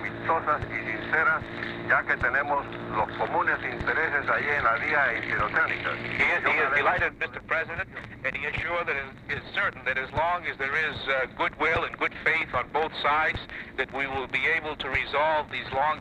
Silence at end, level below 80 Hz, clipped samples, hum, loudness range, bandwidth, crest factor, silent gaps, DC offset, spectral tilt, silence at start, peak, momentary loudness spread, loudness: 0 s; -50 dBFS; under 0.1%; none; 4 LU; 11.5 kHz; 18 dB; none; under 0.1%; -5.5 dB/octave; 0 s; -10 dBFS; 8 LU; -26 LUFS